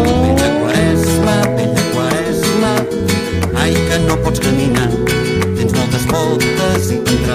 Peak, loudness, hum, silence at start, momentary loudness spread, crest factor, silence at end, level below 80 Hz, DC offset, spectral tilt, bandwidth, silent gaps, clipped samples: -2 dBFS; -14 LUFS; none; 0 s; 3 LU; 12 dB; 0 s; -28 dBFS; under 0.1%; -5.5 dB/octave; 15.5 kHz; none; under 0.1%